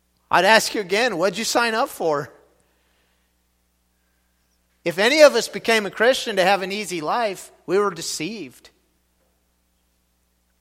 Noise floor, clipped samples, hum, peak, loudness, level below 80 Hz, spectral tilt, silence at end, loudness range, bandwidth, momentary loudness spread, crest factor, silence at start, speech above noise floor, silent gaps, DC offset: -67 dBFS; under 0.1%; 60 Hz at -60 dBFS; 0 dBFS; -19 LUFS; -64 dBFS; -2.5 dB/octave; 2.1 s; 10 LU; 16.5 kHz; 13 LU; 22 dB; 0.3 s; 47 dB; none; under 0.1%